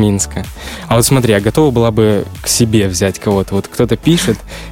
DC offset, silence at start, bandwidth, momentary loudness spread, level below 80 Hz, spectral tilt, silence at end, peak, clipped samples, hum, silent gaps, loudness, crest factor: under 0.1%; 0 s; 17 kHz; 8 LU; -32 dBFS; -5 dB/octave; 0 s; 0 dBFS; under 0.1%; none; none; -13 LUFS; 12 dB